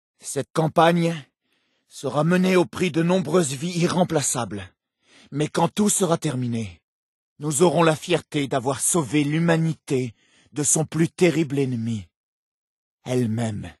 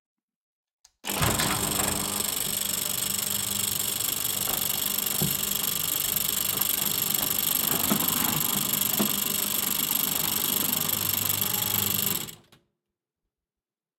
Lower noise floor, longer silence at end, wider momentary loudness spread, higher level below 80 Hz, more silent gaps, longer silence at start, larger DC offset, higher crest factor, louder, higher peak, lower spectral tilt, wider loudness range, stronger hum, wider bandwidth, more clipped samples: second, -70 dBFS vs under -90 dBFS; second, 0.1 s vs 1.65 s; first, 12 LU vs 3 LU; second, -62 dBFS vs -54 dBFS; first, 0.50-0.54 s, 6.83-7.36 s, 12.16-12.98 s vs none; second, 0.25 s vs 1.05 s; neither; about the same, 20 dB vs 20 dB; about the same, -22 LUFS vs -24 LUFS; first, -2 dBFS vs -8 dBFS; first, -5 dB/octave vs -1.5 dB/octave; about the same, 2 LU vs 3 LU; neither; second, 12.5 kHz vs 17 kHz; neither